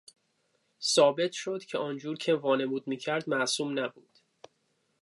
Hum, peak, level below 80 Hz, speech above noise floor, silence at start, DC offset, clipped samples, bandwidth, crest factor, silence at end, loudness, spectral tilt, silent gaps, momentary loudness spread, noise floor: none; -10 dBFS; -86 dBFS; 45 dB; 0.8 s; under 0.1%; under 0.1%; 11.5 kHz; 20 dB; 1.15 s; -29 LUFS; -3.5 dB/octave; none; 11 LU; -75 dBFS